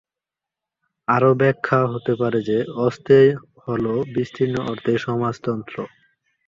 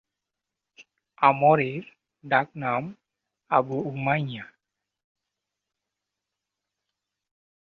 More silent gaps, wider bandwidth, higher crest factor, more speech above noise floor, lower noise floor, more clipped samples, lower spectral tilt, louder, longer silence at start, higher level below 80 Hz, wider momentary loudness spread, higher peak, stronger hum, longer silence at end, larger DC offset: neither; first, 7.4 kHz vs 6.6 kHz; second, 18 dB vs 24 dB; first, 68 dB vs 63 dB; about the same, -87 dBFS vs -86 dBFS; neither; about the same, -8 dB/octave vs -8.5 dB/octave; first, -20 LUFS vs -24 LUFS; first, 1.1 s vs 0.8 s; first, -58 dBFS vs -70 dBFS; about the same, 13 LU vs 15 LU; about the same, -2 dBFS vs -4 dBFS; neither; second, 0.6 s vs 3.3 s; neither